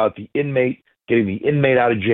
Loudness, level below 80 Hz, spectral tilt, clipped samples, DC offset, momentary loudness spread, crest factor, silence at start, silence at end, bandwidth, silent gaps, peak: -19 LUFS; -56 dBFS; -11.5 dB/octave; under 0.1%; under 0.1%; 7 LU; 14 dB; 0 s; 0 s; 4.1 kHz; none; -4 dBFS